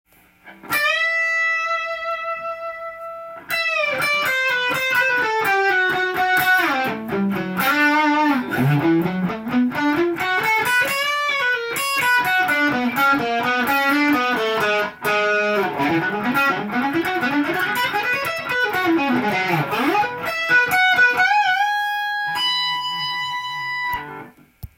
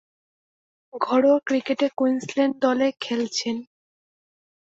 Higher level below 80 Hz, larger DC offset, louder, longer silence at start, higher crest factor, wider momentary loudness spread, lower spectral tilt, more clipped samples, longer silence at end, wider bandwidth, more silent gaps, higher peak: first, -58 dBFS vs -72 dBFS; neither; first, -19 LUFS vs -23 LUFS; second, 0.45 s vs 0.95 s; about the same, 14 dB vs 18 dB; second, 8 LU vs 11 LU; about the same, -4 dB/octave vs -3.5 dB/octave; neither; second, 0.1 s vs 1.05 s; first, 17 kHz vs 8 kHz; neither; about the same, -6 dBFS vs -6 dBFS